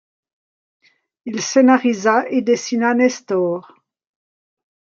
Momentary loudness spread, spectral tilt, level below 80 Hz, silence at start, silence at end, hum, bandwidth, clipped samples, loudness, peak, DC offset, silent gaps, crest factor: 13 LU; -4 dB/octave; -72 dBFS; 1.25 s; 1.25 s; none; 7.6 kHz; under 0.1%; -17 LUFS; -2 dBFS; under 0.1%; none; 16 dB